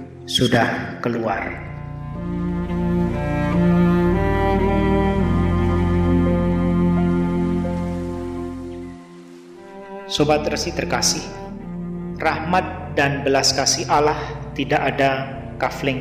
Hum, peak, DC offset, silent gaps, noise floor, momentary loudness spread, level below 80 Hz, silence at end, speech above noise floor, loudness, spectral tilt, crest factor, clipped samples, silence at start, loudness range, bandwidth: none; -4 dBFS; 0.1%; none; -40 dBFS; 14 LU; -34 dBFS; 0 s; 20 dB; -20 LUFS; -5 dB/octave; 16 dB; under 0.1%; 0 s; 5 LU; 15 kHz